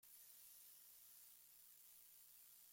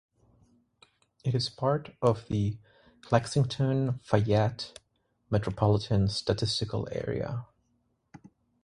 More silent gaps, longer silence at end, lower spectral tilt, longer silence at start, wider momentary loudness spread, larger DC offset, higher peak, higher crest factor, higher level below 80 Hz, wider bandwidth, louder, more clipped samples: neither; second, 0 s vs 1.2 s; second, 1.5 dB/octave vs -6.5 dB/octave; second, 0 s vs 1.25 s; second, 2 LU vs 8 LU; neither; second, -50 dBFS vs -6 dBFS; second, 16 dB vs 24 dB; second, under -90 dBFS vs -52 dBFS; first, 16.5 kHz vs 11 kHz; second, -63 LUFS vs -29 LUFS; neither